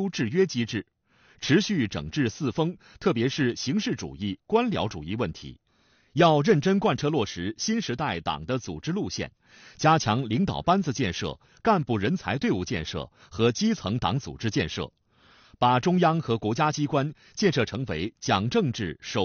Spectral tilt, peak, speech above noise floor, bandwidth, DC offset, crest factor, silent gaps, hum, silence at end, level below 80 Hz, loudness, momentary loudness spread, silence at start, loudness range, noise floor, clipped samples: -5 dB/octave; -8 dBFS; 39 dB; 7 kHz; under 0.1%; 18 dB; none; none; 0 s; -52 dBFS; -26 LUFS; 10 LU; 0 s; 3 LU; -64 dBFS; under 0.1%